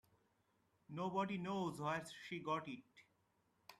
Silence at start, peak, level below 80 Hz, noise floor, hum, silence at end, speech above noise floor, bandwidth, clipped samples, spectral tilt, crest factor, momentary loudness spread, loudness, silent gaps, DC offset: 0.9 s; -28 dBFS; -82 dBFS; -81 dBFS; none; 0.05 s; 37 dB; 14 kHz; under 0.1%; -6 dB/octave; 18 dB; 11 LU; -44 LUFS; none; under 0.1%